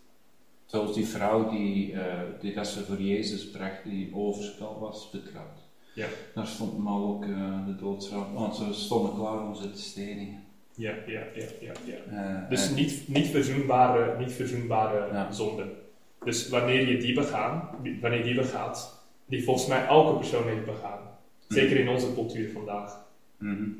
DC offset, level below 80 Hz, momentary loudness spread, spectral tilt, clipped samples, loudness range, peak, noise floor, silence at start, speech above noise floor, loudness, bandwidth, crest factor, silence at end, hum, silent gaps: 0.2%; -62 dBFS; 16 LU; -5 dB/octave; under 0.1%; 8 LU; -6 dBFS; -65 dBFS; 0.7 s; 36 dB; -29 LUFS; 16 kHz; 24 dB; 0 s; none; none